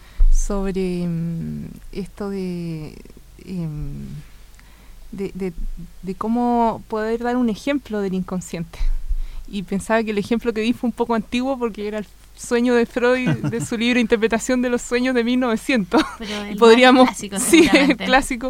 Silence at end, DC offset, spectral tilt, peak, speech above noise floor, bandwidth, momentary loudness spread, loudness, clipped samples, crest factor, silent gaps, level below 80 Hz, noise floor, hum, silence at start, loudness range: 0 s; under 0.1%; -5 dB/octave; 0 dBFS; 24 dB; 16 kHz; 18 LU; -19 LUFS; under 0.1%; 18 dB; none; -28 dBFS; -43 dBFS; none; 0 s; 15 LU